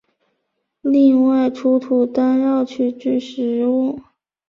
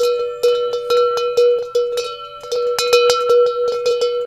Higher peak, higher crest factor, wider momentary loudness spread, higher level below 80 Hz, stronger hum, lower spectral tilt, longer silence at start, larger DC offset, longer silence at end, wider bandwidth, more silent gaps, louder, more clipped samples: second, -4 dBFS vs 0 dBFS; about the same, 12 dB vs 16 dB; about the same, 9 LU vs 8 LU; second, -64 dBFS vs -58 dBFS; neither; first, -7 dB/octave vs -0.5 dB/octave; first, 0.85 s vs 0 s; neither; first, 0.5 s vs 0 s; second, 7 kHz vs 14 kHz; neither; about the same, -17 LUFS vs -16 LUFS; neither